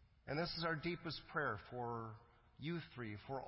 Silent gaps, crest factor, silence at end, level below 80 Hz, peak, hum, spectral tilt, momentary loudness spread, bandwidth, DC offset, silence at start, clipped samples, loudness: none; 18 dB; 0 s; -68 dBFS; -28 dBFS; none; -8.5 dB/octave; 9 LU; 5.8 kHz; under 0.1%; 0 s; under 0.1%; -45 LUFS